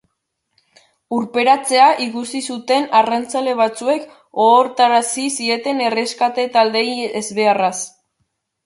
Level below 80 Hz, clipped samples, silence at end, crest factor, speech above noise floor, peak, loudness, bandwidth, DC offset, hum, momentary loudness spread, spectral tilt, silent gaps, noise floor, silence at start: -70 dBFS; under 0.1%; 0.75 s; 16 dB; 57 dB; -2 dBFS; -16 LUFS; 11.5 kHz; under 0.1%; none; 11 LU; -2.5 dB/octave; none; -73 dBFS; 1.1 s